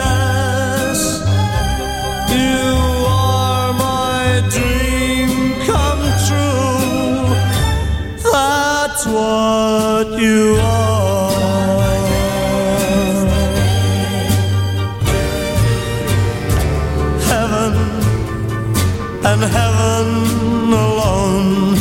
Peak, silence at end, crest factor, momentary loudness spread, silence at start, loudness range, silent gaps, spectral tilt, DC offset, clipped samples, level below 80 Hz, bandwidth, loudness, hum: -2 dBFS; 0 s; 12 dB; 4 LU; 0 s; 2 LU; none; -5 dB/octave; under 0.1%; under 0.1%; -26 dBFS; 17 kHz; -15 LUFS; none